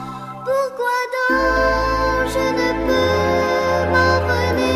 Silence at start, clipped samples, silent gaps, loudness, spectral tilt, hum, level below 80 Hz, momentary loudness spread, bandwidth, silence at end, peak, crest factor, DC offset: 0 s; under 0.1%; none; -18 LUFS; -5 dB/octave; none; -32 dBFS; 5 LU; 15 kHz; 0 s; -2 dBFS; 16 dB; under 0.1%